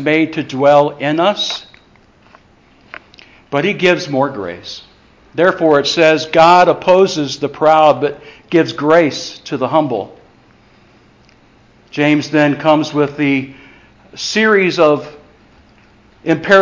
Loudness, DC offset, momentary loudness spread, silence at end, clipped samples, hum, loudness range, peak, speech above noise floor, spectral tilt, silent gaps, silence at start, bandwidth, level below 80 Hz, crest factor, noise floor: -13 LUFS; under 0.1%; 15 LU; 0 s; under 0.1%; none; 8 LU; 0 dBFS; 36 dB; -5 dB/octave; none; 0 s; 7.6 kHz; -54 dBFS; 14 dB; -48 dBFS